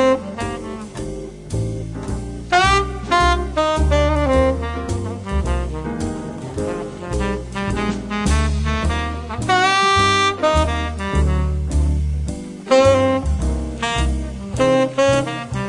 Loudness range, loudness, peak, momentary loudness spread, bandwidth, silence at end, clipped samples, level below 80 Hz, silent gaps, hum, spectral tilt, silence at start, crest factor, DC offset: 5 LU; -19 LUFS; -2 dBFS; 13 LU; 11.5 kHz; 0 s; under 0.1%; -26 dBFS; none; none; -5 dB/octave; 0 s; 16 dB; under 0.1%